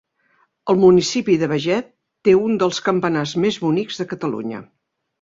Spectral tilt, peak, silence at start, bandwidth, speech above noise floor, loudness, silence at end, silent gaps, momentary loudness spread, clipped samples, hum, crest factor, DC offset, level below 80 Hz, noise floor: -5.5 dB/octave; -2 dBFS; 0.65 s; 7.8 kHz; 45 dB; -18 LUFS; 0.6 s; none; 13 LU; under 0.1%; none; 16 dB; under 0.1%; -58 dBFS; -62 dBFS